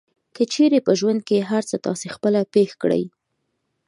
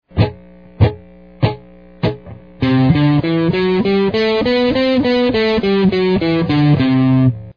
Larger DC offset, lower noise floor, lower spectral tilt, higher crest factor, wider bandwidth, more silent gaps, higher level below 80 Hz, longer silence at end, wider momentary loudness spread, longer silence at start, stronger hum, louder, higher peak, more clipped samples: second, under 0.1% vs 0.3%; first, -74 dBFS vs -38 dBFS; second, -5.5 dB/octave vs -9 dB/octave; about the same, 16 dB vs 14 dB; first, 11.5 kHz vs 5.4 kHz; neither; second, -68 dBFS vs -36 dBFS; first, 0.8 s vs 0.05 s; about the same, 8 LU vs 8 LU; first, 0.4 s vs 0.15 s; neither; second, -20 LUFS vs -15 LUFS; second, -6 dBFS vs 0 dBFS; neither